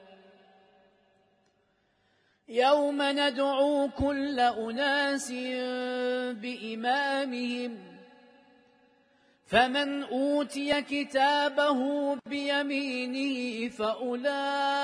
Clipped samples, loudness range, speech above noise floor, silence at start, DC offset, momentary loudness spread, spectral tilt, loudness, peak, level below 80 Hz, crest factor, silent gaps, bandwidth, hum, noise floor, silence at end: under 0.1%; 5 LU; 43 dB; 0.1 s; under 0.1%; 8 LU; -3.5 dB/octave; -28 LUFS; -10 dBFS; -60 dBFS; 20 dB; none; 11 kHz; none; -71 dBFS; 0 s